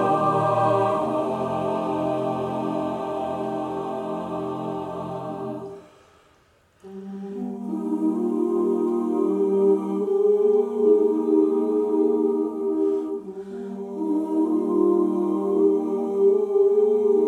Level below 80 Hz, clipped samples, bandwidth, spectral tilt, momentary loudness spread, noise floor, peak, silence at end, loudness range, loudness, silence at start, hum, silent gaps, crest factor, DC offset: -66 dBFS; under 0.1%; 9.8 kHz; -8.5 dB/octave; 12 LU; -60 dBFS; -8 dBFS; 0 s; 11 LU; -23 LUFS; 0 s; none; none; 16 dB; under 0.1%